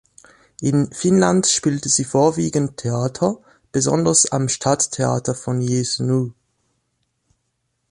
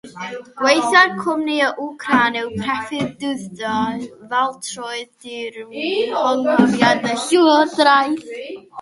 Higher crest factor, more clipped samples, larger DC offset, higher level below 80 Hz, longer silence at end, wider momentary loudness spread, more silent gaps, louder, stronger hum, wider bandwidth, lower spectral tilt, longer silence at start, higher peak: about the same, 18 dB vs 18 dB; neither; neither; about the same, -54 dBFS vs -58 dBFS; first, 1.6 s vs 0 s; second, 8 LU vs 16 LU; neither; about the same, -19 LUFS vs -17 LUFS; neither; about the same, 11.5 kHz vs 11.5 kHz; about the same, -4.5 dB/octave vs -4 dB/octave; first, 0.6 s vs 0.05 s; about the same, -2 dBFS vs 0 dBFS